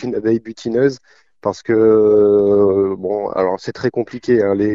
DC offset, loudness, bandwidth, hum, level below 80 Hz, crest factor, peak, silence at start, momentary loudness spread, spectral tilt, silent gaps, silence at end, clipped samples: 0.1%; -16 LUFS; 7.4 kHz; none; -54 dBFS; 14 dB; -2 dBFS; 0 s; 11 LU; -7.5 dB/octave; none; 0 s; under 0.1%